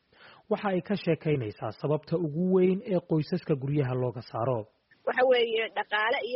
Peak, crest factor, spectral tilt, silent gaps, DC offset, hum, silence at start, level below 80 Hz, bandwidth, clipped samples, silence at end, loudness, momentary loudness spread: -14 dBFS; 14 dB; -5 dB/octave; none; under 0.1%; none; 0.25 s; -66 dBFS; 5.8 kHz; under 0.1%; 0 s; -28 LUFS; 9 LU